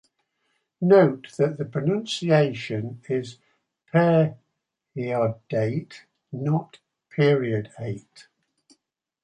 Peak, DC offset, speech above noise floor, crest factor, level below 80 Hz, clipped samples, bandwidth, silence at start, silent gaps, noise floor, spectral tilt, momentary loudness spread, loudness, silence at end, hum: -6 dBFS; under 0.1%; 57 dB; 20 dB; -66 dBFS; under 0.1%; 10.5 kHz; 0.8 s; none; -80 dBFS; -7.5 dB/octave; 16 LU; -24 LUFS; 1.25 s; none